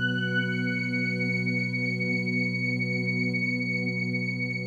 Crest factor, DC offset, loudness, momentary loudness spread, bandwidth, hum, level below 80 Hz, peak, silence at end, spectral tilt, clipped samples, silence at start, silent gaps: 12 dB; under 0.1%; -27 LUFS; 2 LU; 9.4 kHz; none; -74 dBFS; -16 dBFS; 0 s; -6.5 dB/octave; under 0.1%; 0 s; none